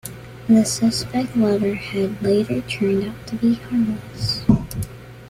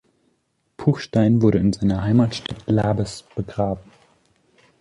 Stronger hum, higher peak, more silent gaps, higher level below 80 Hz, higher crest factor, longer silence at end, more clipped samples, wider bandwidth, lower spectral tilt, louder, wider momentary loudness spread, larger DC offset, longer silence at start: neither; about the same, -2 dBFS vs -4 dBFS; neither; about the same, -42 dBFS vs -44 dBFS; about the same, 18 dB vs 18 dB; second, 0 s vs 1 s; neither; first, 15.5 kHz vs 11 kHz; second, -5.5 dB/octave vs -7.5 dB/octave; about the same, -20 LUFS vs -21 LUFS; about the same, 12 LU vs 12 LU; neither; second, 0.05 s vs 0.8 s